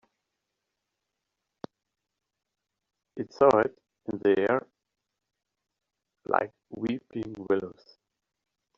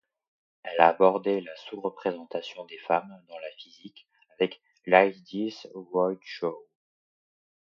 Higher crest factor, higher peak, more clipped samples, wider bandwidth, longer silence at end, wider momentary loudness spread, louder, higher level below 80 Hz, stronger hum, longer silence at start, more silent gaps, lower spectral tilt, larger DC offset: about the same, 26 dB vs 26 dB; second, -6 dBFS vs -2 dBFS; neither; about the same, 7.4 kHz vs 7 kHz; about the same, 1.05 s vs 1.15 s; first, 24 LU vs 21 LU; about the same, -28 LUFS vs -27 LUFS; first, -70 dBFS vs -80 dBFS; neither; first, 3.15 s vs 0.65 s; neither; second, -5 dB/octave vs -6.5 dB/octave; neither